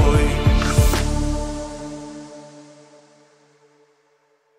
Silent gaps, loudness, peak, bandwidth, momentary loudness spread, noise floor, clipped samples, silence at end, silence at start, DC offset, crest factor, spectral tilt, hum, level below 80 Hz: none; -21 LUFS; -2 dBFS; 16 kHz; 21 LU; -62 dBFS; under 0.1%; 2 s; 0 s; under 0.1%; 18 dB; -5.5 dB/octave; none; -24 dBFS